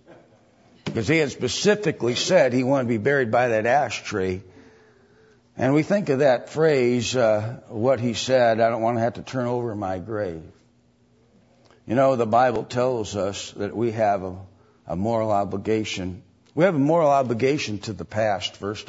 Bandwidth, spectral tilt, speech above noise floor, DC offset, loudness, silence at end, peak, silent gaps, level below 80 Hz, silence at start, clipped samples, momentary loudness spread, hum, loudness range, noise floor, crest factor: 8 kHz; -5.5 dB/octave; 38 dB; under 0.1%; -22 LUFS; 0.05 s; -6 dBFS; none; -60 dBFS; 0.1 s; under 0.1%; 11 LU; none; 5 LU; -60 dBFS; 16 dB